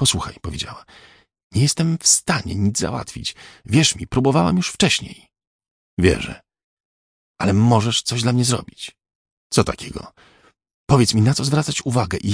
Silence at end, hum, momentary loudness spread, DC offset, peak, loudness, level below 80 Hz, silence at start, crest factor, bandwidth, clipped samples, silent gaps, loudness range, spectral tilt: 0 s; none; 15 LU; under 0.1%; -2 dBFS; -19 LUFS; -42 dBFS; 0 s; 20 dB; 10.5 kHz; under 0.1%; 1.43-1.50 s, 5.47-5.59 s, 5.71-5.97 s, 6.64-7.35 s, 9.15-9.25 s, 9.32-9.50 s, 10.74-10.87 s; 3 LU; -4.5 dB/octave